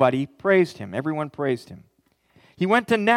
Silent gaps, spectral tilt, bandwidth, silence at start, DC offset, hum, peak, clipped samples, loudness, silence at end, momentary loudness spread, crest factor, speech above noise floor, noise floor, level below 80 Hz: none; -6.5 dB/octave; 14 kHz; 0 s; under 0.1%; none; -4 dBFS; under 0.1%; -23 LUFS; 0 s; 8 LU; 18 dB; 40 dB; -62 dBFS; -68 dBFS